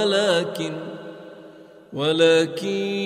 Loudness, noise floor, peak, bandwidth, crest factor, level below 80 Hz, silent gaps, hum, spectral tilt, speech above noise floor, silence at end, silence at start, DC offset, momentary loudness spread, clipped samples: -21 LUFS; -45 dBFS; -6 dBFS; 15 kHz; 18 dB; -70 dBFS; none; none; -4.5 dB/octave; 24 dB; 0 s; 0 s; under 0.1%; 22 LU; under 0.1%